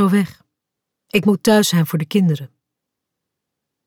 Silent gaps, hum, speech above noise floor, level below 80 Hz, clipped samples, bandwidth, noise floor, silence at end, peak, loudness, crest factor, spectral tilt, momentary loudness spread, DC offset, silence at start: none; none; 65 dB; -58 dBFS; under 0.1%; 18 kHz; -81 dBFS; 1.4 s; -4 dBFS; -17 LUFS; 16 dB; -5.5 dB/octave; 8 LU; under 0.1%; 0 s